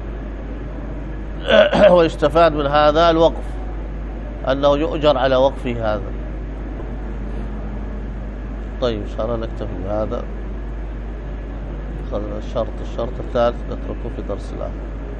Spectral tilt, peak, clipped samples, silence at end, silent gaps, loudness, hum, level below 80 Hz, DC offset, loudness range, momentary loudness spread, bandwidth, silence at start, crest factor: -7 dB/octave; 0 dBFS; under 0.1%; 0 s; none; -20 LUFS; none; -28 dBFS; under 0.1%; 12 LU; 16 LU; 8.6 kHz; 0 s; 20 dB